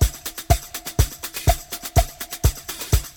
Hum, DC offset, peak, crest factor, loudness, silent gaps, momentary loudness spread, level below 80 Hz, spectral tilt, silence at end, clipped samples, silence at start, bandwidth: none; under 0.1%; -2 dBFS; 20 dB; -24 LUFS; none; 6 LU; -26 dBFS; -4 dB/octave; 0.05 s; under 0.1%; 0 s; 19.5 kHz